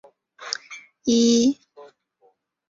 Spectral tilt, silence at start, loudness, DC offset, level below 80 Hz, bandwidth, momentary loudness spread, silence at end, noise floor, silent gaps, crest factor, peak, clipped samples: -3.5 dB/octave; 0.4 s; -21 LUFS; under 0.1%; -64 dBFS; 7.8 kHz; 21 LU; 0.85 s; -63 dBFS; none; 20 dB; -4 dBFS; under 0.1%